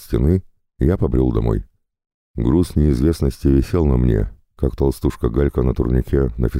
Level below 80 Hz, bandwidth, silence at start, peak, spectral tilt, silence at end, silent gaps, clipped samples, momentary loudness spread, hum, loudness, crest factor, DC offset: -24 dBFS; 15.5 kHz; 0 s; -4 dBFS; -9 dB/octave; 0 s; 2.14-2.34 s; under 0.1%; 6 LU; none; -19 LUFS; 14 dB; under 0.1%